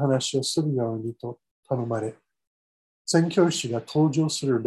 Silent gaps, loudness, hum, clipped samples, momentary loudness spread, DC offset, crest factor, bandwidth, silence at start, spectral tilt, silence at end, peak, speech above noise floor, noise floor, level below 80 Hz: 1.51-1.63 s, 2.47-3.05 s; -25 LUFS; none; under 0.1%; 13 LU; under 0.1%; 18 dB; 12.5 kHz; 0 s; -5.5 dB/octave; 0 s; -6 dBFS; over 66 dB; under -90 dBFS; -68 dBFS